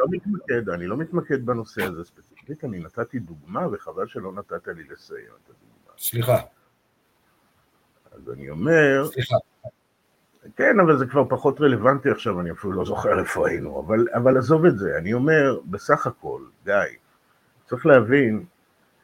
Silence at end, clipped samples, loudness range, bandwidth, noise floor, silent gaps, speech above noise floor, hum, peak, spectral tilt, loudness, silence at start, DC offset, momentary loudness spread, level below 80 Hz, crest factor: 0.55 s; under 0.1%; 11 LU; 17 kHz; -66 dBFS; none; 44 dB; none; 0 dBFS; -6.5 dB/octave; -22 LUFS; 0 s; under 0.1%; 18 LU; -56 dBFS; 22 dB